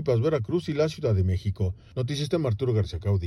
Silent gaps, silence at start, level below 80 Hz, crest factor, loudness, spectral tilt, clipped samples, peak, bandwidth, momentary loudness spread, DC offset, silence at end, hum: none; 0 s; -46 dBFS; 14 dB; -27 LUFS; -7.5 dB/octave; under 0.1%; -12 dBFS; 11.5 kHz; 6 LU; under 0.1%; 0 s; none